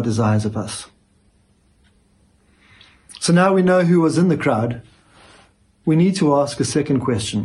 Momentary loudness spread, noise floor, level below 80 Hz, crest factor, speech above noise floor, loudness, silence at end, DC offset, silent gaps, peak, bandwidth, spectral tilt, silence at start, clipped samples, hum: 12 LU; -58 dBFS; -54 dBFS; 16 dB; 41 dB; -18 LUFS; 0 s; under 0.1%; none; -4 dBFS; 11.5 kHz; -6 dB/octave; 0 s; under 0.1%; none